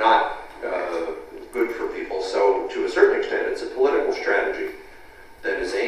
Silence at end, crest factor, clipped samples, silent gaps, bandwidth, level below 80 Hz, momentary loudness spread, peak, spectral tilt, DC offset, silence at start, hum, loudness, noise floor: 0 s; 20 dB; under 0.1%; none; 12.5 kHz; -52 dBFS; 13 LU; -2 dBFS; -3.5 dB/octave; under 0.1%; 0 s; none; -23 LUFS; -44 dBFS